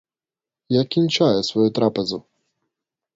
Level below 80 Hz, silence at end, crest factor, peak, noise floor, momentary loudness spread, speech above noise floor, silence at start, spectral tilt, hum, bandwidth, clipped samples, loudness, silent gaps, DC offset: -62 dBFS; 0.95 s; 18 dB; -4 dBFS; under -90 dBFS; 8 LU; over 71 dB; 0.7 s; -6 dB/octave; none; 7.8 kHz; under 0.1%; -20 LUFS; none; under 0.1%